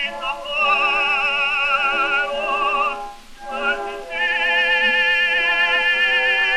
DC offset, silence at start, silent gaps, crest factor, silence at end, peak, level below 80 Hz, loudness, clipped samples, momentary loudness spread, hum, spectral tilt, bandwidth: under 0.1%; 0 s; none; 14 dB; 0 s; -6 dBFS; -46 dBFS; -17 LUFS; under 0.1%; 10 LU; none; -1 dB/octave; 13 kHz